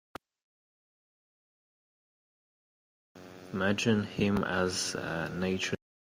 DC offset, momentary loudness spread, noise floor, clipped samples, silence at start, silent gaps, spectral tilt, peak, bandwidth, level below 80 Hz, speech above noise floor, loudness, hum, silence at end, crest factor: under 0.1%; 21 LU; under -90 dBFS; under 0.1%; 3.15 s; none; -4.5 dB/octave; -14 dBFS; 16 kHz; -64 dBFS; over 60 dB; -31 LUFS; none; 0.3 s; 20 dB